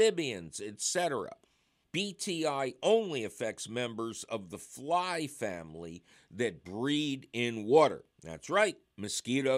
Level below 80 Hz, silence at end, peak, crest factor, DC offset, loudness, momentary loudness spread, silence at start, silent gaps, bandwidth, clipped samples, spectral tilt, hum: -72 dBFS; 0 s; -12 dBFS; 20 dB; under 0.1%; -32 LUFS; 17 LU; 0 s; none; 15.5 kHz; under 0.1%; -3.5 dB/octave; none